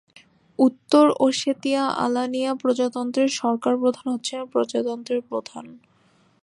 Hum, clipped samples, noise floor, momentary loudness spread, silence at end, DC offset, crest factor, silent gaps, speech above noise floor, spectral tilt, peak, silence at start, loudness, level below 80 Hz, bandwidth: none; under 0.1%; -60 dBFS; 10 LU; 0.65 s; under 0.1%; 18 dB; none; 38 dB; -4 dB/octave; -4 dBFS; 0.6 s; -22 LUFS; -74 dBFS; 11 kHz